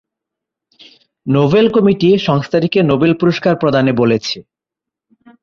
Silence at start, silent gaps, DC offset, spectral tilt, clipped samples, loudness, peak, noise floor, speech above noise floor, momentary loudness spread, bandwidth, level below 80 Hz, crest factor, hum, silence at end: 1.25 s; none; under 0.1%; -7 dB/octave; under 0.1%; -13 LUFS; 0 dBFS; -84 dBFS; 72 dB; 7 LU; 7.2 kHz; -50 dBFS; 14 dB; none; 1 s